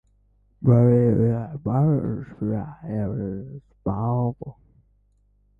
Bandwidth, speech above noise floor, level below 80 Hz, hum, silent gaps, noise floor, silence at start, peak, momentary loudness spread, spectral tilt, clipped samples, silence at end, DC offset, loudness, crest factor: 2.5 kHz; 40 dB; -48 dBFS; 50 Hz at -45 dBFS; none; -62 dBFS; 0.6 s; -6 dBFS; 14 LU; -13 dB/octave; under 0.1%; 1.1 s; under 0.1%; -23 LUFS; 18 dB